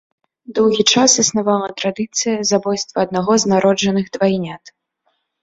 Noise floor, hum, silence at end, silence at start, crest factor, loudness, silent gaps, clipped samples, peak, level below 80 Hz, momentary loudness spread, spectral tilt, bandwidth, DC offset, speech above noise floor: -67 dBFS; none; 0.75 s; 0.5 s; 18 dB; -16 LUFS; none; under 0.1%; 0 dBFS; -56 dBFS; 10 LU; -3.5 dB/octave; 8 kHz; under 0.1%; 51 dB